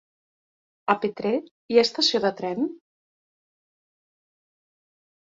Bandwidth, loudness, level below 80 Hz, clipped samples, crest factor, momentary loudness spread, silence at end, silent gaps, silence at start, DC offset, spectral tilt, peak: 7.8 kHz; -24 LUFS; -72 dBFS; under 0.1%; 24 dB; 9 LU; 2.5 s; 1.51-1.69 s; 0.85 s; under 0.1%; -4 dB/octave; -4 dBFS